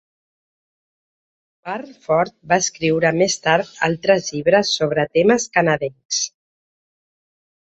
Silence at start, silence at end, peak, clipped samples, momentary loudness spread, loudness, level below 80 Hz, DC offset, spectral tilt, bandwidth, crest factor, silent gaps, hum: 1.65 s; 1.45 s; -2 dBFS; under 0.1%; 11 LU; -18 LUFS; -58 dBFS; under 0.1%; -3.5 dB/octave; 8.2 kHz; 20 dB; 6.05-6.09 s; none